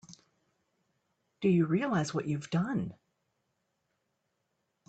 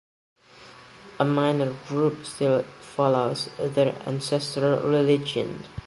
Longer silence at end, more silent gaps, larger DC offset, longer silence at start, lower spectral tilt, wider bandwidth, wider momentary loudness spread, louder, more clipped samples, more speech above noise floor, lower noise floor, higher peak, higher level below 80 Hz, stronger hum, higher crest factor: first, 1.95 s vs 0 s; neither; neither; second, 0.1 s vs 0.6 s; about the same, -7 dB/octave vs -6 dB/octave; second, 8.8 kHz vs 11.5 kHz; about the same, 7 LU vs 7 LU; second, -31 LUFS vs -25 LUFS; neither; first, 51 dB vs 25 dB; first, -81 dBFS vs -49 dBFS; second, -16 dBFS vs -6 dBFS; second, -72 dBFS vs -58 dBFS; neither; about the same, 18 dB vs 20 dB